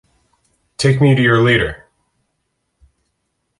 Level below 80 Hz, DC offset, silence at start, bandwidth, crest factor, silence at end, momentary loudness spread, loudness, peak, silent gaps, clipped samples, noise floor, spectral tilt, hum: -42 dBFS; under 0.1%; 0.8 s; 11.5 kHz; 16 dB; 1.85 s; 21 LU; -14 LUFS; -2 dBFS; none; under 0.1%; -70 dBFS; -6 dB/octave; none